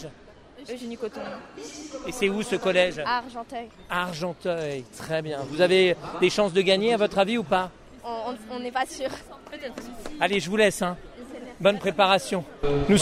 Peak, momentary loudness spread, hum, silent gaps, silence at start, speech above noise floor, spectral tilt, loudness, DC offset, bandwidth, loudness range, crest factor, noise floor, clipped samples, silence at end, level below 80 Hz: -6 dBFS; 18 LU; none; none; 0 s; 23 dB; -4.5 dB/octave; -25 LUFS; under 0.1%; 15 kHz; 5 LU; 20 dB; -49 dBFS; under 0.1%; 0 s; -48 dBFS